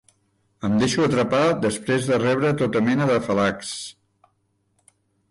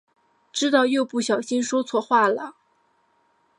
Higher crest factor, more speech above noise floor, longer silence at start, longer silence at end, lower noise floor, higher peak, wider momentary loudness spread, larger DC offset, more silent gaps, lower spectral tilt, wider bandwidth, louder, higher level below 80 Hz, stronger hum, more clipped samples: second, 14 dB vs 20 dB; first, 48 dB vs 44 dB; about the same, 0.6 s vs 0.55 s; first, 1.4 s vs 1.05 s; first, -69 dBFS vs -65 dBFS; second, -10 dBFS vs -4 dBFS; about the same, 11 LU vs 10 LU; neither; neither; first, -5.5 dB/octave vs -3 dB/octave; about the same, 11.5 kHz vs 11 kHz; about the same, -21 LUFS vs -22 LUFS; first, -54 dBFS vs -78 dBFS; neither; neither